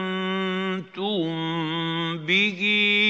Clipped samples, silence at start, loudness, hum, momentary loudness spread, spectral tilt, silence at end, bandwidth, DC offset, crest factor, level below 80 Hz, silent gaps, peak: under 0.1%; 0 s; -24 LUFS; none; 8 LU; -5.5 dB/octave; 0 s; 7.8 kHz; under 0.1%; 16 dB; -82 dBFS; none; -8 dBFS